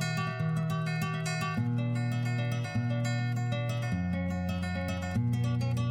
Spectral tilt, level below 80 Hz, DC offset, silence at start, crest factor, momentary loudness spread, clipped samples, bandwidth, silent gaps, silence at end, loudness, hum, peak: -6.5 dB/octave; -54 dBFS; under 0.1%; 0 s; 12 dB; 3 LU; under 0.1%; 14.5 kHz; none; 0 s; -32 LUFS; none; -20 dBFS